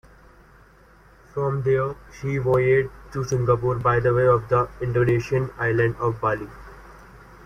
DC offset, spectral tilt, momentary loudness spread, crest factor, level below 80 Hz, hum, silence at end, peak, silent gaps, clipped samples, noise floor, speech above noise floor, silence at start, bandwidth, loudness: under 0.1%; -7.5 dB/octave; 11 LU; 16 dB; -46 dBFS; none; 0 s; -6 dBFS; none; under 0.1%; -52 dBFS; 30 dB; 1.35 s; 9.8 kHz; -22 LUFS